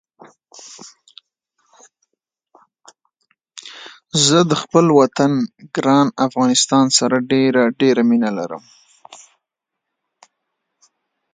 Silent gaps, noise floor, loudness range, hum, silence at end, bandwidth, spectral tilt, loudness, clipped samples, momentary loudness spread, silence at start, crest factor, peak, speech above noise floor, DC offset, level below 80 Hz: none; -81 dBFS; 7 LU; none; 2.2 s; 9.6 kHz; -4 dB/octave; -15 LUFS; under 0.1%; 23 LU; 0.65 s; 18 dB; 0 dBFS; 65 dB; under 0.1%; -66 dBFS